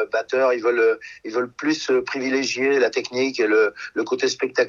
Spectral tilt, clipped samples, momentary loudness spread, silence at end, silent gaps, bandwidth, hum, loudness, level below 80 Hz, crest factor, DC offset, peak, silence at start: -3 dB/octave; under 0.1%; 7 LU; 0 s; none; 7.6 kHz; none; -21 LUFS; -68 dBFS; 14 dB; under 0.1%; -6 dBFS; 0 s